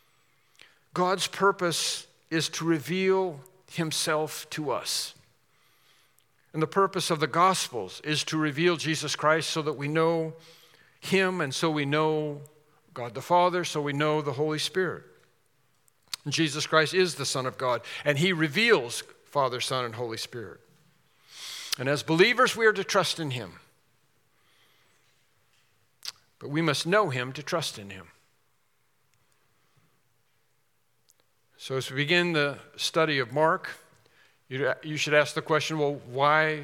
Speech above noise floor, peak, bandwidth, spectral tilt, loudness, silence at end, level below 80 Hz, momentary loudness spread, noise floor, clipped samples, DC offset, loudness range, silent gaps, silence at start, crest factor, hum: 47 dB; -6 dBFS; 17.5 kHz; -4 dB/octave; -27 LUFS; 0 s; -80 dBFS; 15 LU; -73 dBFS; under 0.1%; under 0.1%; 6 LU; none; 0.95 s; 24 dB; none